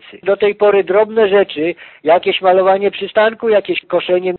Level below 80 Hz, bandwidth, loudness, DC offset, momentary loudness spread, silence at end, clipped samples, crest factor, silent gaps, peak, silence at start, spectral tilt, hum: -58 dBFS; 4.3 kHz; -14 LUFS; under 0.1%; 6 LU; 0 s; under 0.1%; 12 dB; none; 0 dBFS; 0.15 s; -2.5 dB/octave; none